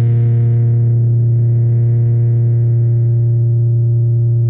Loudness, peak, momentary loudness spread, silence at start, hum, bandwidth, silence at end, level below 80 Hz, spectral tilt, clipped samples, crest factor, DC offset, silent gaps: -13 LUFS; -8 dBFS; 1 LU; 0 s; none; 0.9 kHz; 0 s; -44 dBFS; -14 dB/octave; under 0.1%; 4 dB; under 0.1%; none